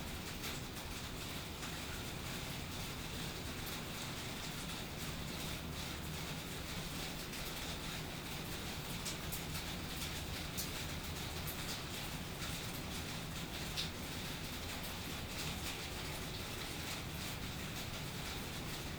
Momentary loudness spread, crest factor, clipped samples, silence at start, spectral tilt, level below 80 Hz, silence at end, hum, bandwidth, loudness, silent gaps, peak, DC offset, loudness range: 2 LU; 18 dB; under 0.1%; 0 s; -3.5 dB/octave; -54 dBFS; 0 s; none; over 20 kHz; -43 LUFS; none; -26 dBFS; under 0.1%; 1 LU